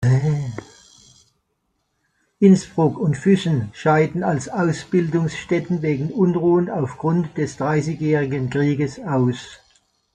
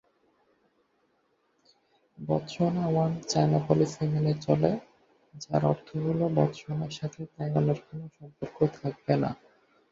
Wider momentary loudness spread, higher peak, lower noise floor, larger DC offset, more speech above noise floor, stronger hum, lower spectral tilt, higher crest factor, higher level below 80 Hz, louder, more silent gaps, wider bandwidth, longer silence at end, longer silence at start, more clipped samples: second, 7 LU vs 15 LU; first, -2 dBFS vs -6 dBFS; about the same, -71 dBFS vs -71 dBFS; neither; first, 52 dB vs 44 dB; neither; about the same, -7.5 dB/octave vs -7.5 dB/octave; second, 18 dB vs 24 dB; first, -54 dBFS vs -62 dBFS; first, -20 LUFS vs -28 LUFS; neither; first, 9.4 kHz vs 7.6 kHz; about the same, 0.6 s vs 0.6 s; second, 0 s vs 2.2 s; neither